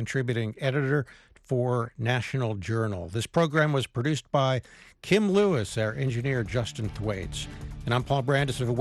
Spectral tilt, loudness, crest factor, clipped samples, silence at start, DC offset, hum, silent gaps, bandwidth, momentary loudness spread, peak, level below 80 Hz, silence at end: -6 dB/octave; -27 LUFS; 18 dB; under 0.1%; 0 s; under 0.1%; none; none; 12.5 kHz; 9 LU; -8 dBFS; -48 dBFS; 0 s